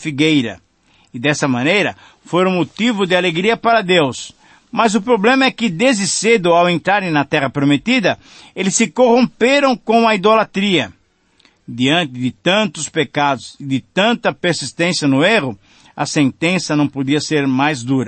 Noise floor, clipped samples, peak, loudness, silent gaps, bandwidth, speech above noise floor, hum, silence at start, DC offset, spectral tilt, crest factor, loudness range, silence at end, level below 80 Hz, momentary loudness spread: -55 dBFS; under 0.1%; -2 dBFS; -15 LUFS; none; 8.8 kHz; 40 dB; none; 0 s; under 0.1%; -4.5 dB/octave; 14 dB; 3 LU; 0 s; -58 dBFS; 8 LU